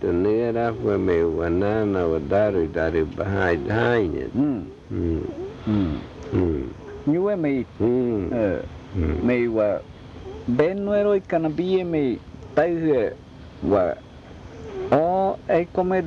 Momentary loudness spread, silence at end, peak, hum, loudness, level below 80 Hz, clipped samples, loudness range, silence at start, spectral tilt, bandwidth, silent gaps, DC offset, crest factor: 12 LU; 0 s; -6 dBFS; none; -23 LUFS; -44 dBFS; under 0.1%; 3 LU; 0 s; -9 dB/octave; 7.2 kHz; none; under 0.1%; 16 dB